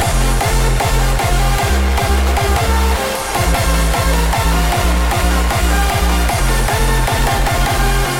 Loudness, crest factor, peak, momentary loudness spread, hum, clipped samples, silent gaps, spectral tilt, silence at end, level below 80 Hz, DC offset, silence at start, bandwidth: -15 LUFS; 12 dB; -2 dBFS; 1 LU; none; under 0.1%; none; -4 dB/octave; 0 s; -16 dBFS; under 0.1%; 0 s; 17 kHz